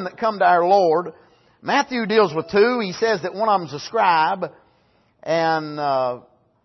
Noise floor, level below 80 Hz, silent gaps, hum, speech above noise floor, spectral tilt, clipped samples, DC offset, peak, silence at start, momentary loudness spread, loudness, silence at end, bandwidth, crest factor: -60 dBFS; -66 dBFS; none; none; 41 dB; -5 dB/octave; under 0.1%; under 0.1%; -4 dBFS; 0 s; 11 LU; -19 LUFS; 0.45 s; 6.2 kHz; 16 dB